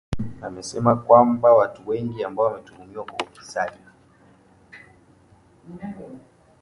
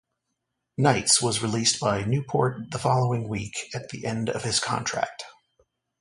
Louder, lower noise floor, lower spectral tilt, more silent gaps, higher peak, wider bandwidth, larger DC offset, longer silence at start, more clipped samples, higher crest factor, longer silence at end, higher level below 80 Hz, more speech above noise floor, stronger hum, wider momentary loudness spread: first, -21 LUFS vs -25 LUFS; second, -55 dBFS vs -80 dBFS; first, -6.5 dB/octave vs -3.5 dB/octave; neither; first, 0 dBFS vs -6 dBFS; about the same, 11 kHz vs 11.5 kHz; neither; second, 0.1 s vs 0.8 s; neither; about the same, 22 dB vs 22 dB; second, 0.45 s vs 0.7 s; first, -50 dBFS vs -56 dBFS; second, 33 dB vs 55 dB; neither; first, 22 LU vs 13 LU